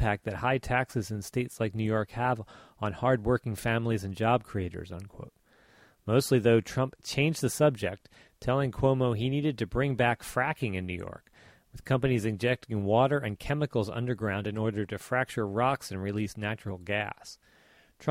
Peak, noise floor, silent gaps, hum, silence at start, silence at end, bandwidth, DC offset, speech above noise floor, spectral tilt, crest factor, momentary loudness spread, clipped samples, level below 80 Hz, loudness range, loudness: -12 dBFS; -61 dBFS; none; none; 0 s; 0 s; 16.5 kHz; under 0.1%; 32 dB; -6 dB/octave; 18 dB; 12 LU; under 0.1%; -52 dBFS; 3 LU; -30 LUFS